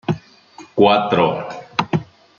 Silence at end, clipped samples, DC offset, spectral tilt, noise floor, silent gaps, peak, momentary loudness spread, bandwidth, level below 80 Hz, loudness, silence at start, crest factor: 0.35 s; under 0.1%; under 0.1%; -6.5 dB/octave; -44 dBFS; none; -2 dBFS; 13 LU; 7.2 kHz; -56 dBFS; -18 LUFS; 0.1 s; 18 dB